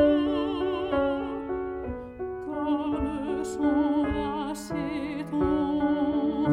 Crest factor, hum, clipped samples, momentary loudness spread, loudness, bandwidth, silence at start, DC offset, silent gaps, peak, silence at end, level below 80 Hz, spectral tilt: 16 dB; none; under 0.1%; 8 LU; -28 LUFS; 11.5 kHz; 0 s; under 0.1%; none; -12 dBFS; 0 s; -46 dBFS; -6.5 dB/octave